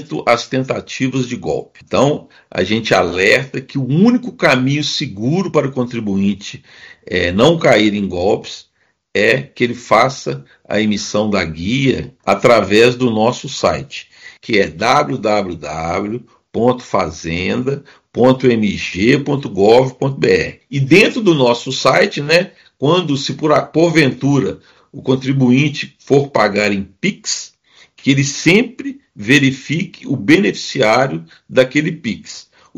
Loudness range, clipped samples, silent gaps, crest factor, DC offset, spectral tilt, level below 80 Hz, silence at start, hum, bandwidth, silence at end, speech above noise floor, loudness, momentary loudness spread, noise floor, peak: 4 LU; 0.2%; none; 16 dB; under 0.1%; -5 dB/octave; -48 dBFS; 0 s; none; 13 kHz; 0.35 s; 33 dB; -15 LUFS; 12 LU; -48 dBFS; 0 dBFS